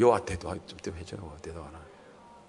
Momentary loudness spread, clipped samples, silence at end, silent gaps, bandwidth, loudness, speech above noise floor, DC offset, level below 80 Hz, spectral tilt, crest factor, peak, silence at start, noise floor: 22 LU; under 0.1%; 0.05 s; none; 11 kHz; -34 LUFS; 22 dB; under 0.1%; -54 dBFS; -6 dB/octave; 22 dB; -8 dBFS; 0 s; -53 dBFS